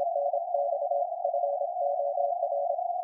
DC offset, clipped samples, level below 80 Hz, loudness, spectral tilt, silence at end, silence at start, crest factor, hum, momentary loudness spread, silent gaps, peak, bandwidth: under 0.1%; under 0.1%; under -90 dBFS; -29 LUFS; -3.5 dB/octave; 0 s; 0 s; 14 dB; none; 1 LU; none; -16 dBFS; 1 kHz